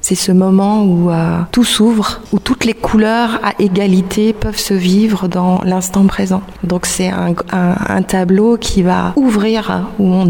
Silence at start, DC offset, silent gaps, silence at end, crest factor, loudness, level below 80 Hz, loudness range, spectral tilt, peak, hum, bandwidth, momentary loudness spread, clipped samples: 0.05 s; under 0.1%; none; 0 s; 12 dB; -13 LUFS; -32 dBFS; 2 LU; -5.5 dB/octave; 0 dBFS; none; 18 kHz; 5 LU; under 0.1%